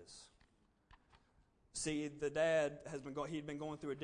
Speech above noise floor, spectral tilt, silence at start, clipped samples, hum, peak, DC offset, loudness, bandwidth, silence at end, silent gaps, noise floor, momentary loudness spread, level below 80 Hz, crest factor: 33 dB; -4.5 dB/octave; 0 s; under 0.1%; none; -26 dBFS; under 0.1%; -41 LUFS; 10 kHz; 0 s; none; -74 dBFS; 14 LU; -70 dBFS; 18 dB